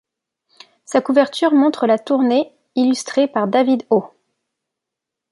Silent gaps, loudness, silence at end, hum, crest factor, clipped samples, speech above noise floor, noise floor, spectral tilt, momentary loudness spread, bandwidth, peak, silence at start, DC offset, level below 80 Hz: none; -17 LUFS; 1.25 s; none; 16 dB; under 0.1%; 67 dB; -83 dBFS; -5 dB/octave; 5 LU; 11.5 kHz; -2 dBFS; 0.9 s; under 0.1%; -72 dBFS